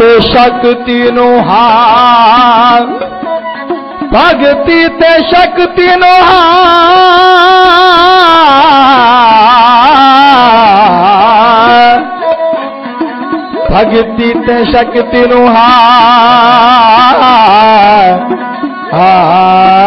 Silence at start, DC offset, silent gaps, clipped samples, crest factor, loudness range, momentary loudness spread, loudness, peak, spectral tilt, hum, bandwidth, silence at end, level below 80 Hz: 0 s; under 0.1%; none; 0.7%; 4 dB; 5 LU; 11 LU; -4 LUFS; 0 dBFS; -5.5 dB/octave; none; 6.4 kHz; 0 s; -32 dBFS